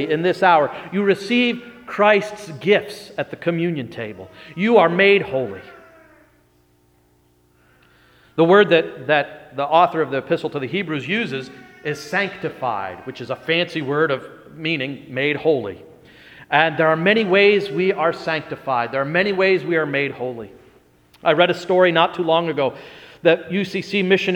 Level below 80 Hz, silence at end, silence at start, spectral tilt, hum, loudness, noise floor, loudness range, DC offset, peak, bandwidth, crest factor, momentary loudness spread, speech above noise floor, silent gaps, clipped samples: -64 dBFS; 0 s; 0 s; -6 dB/octave; 60 Hz at -55 dBFS; -19 LUFS; -58 dBFS; 5 LU; under 0.1%; 0 dBFS; 11.5 kHz; 20 dB; 15 LU; 39 dB; none; under 0.1%